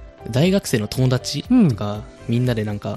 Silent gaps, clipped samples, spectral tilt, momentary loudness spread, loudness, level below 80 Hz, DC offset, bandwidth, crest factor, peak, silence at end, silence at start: none; under 0.1%; -6.5 dB/octave; 9 LU; -20 LUFS; -44 dBFS; under 0.1%; 14 kHz; 16 dB; -4 dBFS; 0 s; 0 s